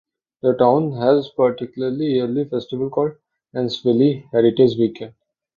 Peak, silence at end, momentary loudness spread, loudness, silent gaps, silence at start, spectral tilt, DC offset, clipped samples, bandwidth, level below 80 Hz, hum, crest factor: -2 dBFS; 0.45 s; 9 LU; -19 LUFS; none; 0.45 s; -8.5 dB/octave; under 0.1%; under 0.1%; 7 kHz; -60 dBFS; none; 16 dB